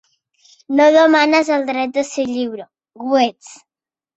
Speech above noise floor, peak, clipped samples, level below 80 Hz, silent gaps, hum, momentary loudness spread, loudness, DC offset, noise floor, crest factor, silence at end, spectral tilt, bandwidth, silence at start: over 75 dB; -2 dBFS; under 0.1%; -64 dBFS; none; none; 13 LU; -15 LUFS; under 0.1%; under -90 dBFS; 16 dB; 0.6 s; -3 dB/octave; 8.2 kHz; 0.7 s